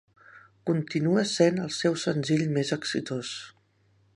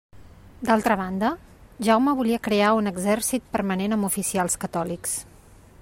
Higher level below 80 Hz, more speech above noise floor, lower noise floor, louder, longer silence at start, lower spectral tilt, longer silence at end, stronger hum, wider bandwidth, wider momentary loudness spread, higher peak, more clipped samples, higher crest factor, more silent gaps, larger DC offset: second, -70 dBFS vs -52 dBFS; first, 39 dB vs 27 dB; first, -65 dBFS vs -50 dBFS; second, -27 LUFS vs -23 LUFS; first, 0.35 s vs 0.15 s; about the same, -5.5 dB/octave vs -4.5 dB/octave; about the same, 0.65 s vs 0.6 s; neither; second, 11.5 kHz vs 16 kHz; first, 13 LU vs 8 LU; about the same, -8 dBFS vs -6 dBFS; neither; about the same, 20 dB vs 18 dB; neither; neither